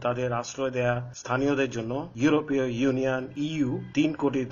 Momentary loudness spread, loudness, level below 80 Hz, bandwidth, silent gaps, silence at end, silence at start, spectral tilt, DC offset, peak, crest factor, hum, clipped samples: 6 LU; -27 LUFS; -56 dBFS; 7.2 kHz; none; 0 s; 0 s; -5.5 dB/octave; under 0.1%; -10 dBFS; 16 dB; none; under 0.1%